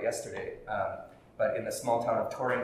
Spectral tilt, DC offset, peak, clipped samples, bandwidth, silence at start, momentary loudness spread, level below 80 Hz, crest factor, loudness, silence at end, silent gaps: -4.5 dB/octave; under 0.1%; -16 dBFS; under 0.1%; 15.5 kHz; 0 s; 11 LU; -62 dBFS; 16 dB; -33 LUFS; 0 s; none